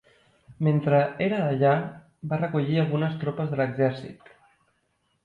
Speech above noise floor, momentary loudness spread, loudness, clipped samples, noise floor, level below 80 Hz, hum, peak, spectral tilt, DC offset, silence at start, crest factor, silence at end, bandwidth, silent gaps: 47 dB; 12 LU; -25 LUFS; under 0.1%; -72 dBFS; -64 dBFS; none; -10 dBFS; -9.5 dB/octave; under 0.1%; 0.5 s; 16 dB; 1.1 s; 5 kHz; none